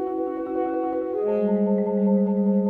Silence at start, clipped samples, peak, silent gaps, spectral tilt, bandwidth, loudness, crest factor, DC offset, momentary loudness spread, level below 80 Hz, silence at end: 0 s; under 0.1%; -12 dBFS; none; -12 dB/octave; 3.3 kHz; -23 LUFS; 12 dB; under 0.1%; 6 LU; -60 dBFS; 0 s